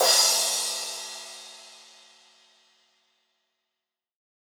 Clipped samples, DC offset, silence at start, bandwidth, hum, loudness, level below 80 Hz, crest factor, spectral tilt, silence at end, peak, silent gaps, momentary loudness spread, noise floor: under 0.1%; under 0.1%; 0 s; over 20 kHz; none; -23 LUFS; under -90 dBFS; 22 dB; 3.5 dB/octave; 2.8 s; -8 dBFS; none; 26 LU; -87 dBFS